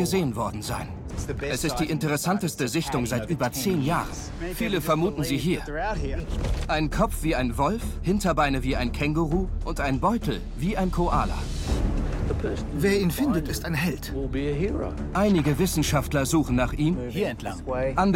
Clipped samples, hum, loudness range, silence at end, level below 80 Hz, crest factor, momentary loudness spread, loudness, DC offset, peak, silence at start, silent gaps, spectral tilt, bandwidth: under 0.1%; none; 2 LU; 0 s; -32 dBFS; 16 dB; 7 LU; -26 LUFS; under 0.1%; -8 dBFS; 0 s; none; -5.5 dB/octave; 16.5 kHz